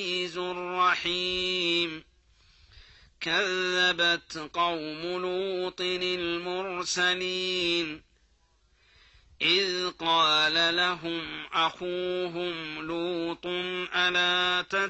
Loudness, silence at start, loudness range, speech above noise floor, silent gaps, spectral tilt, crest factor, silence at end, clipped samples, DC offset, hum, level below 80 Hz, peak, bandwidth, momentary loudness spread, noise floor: -27 LUFS; 0 s; 4 LU; 38 dB; none; -2.5 dB/octave; 16 dB; 0 s; under 0.1%; under 0.1%; none; -62 dBFS; -12 dBFS; 8.4 kHz; 10 LU; -66 dBFS